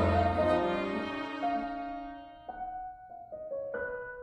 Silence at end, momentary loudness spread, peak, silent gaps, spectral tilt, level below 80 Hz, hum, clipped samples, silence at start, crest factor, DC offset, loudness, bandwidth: 0 s; 18 LU; -16 dBFS; none; -7.5 dB/octave; -50 dBFS; none; under 0.1%; 0 s; 18 dB; under 0.1%; -33 LUFS; 9.8 kHz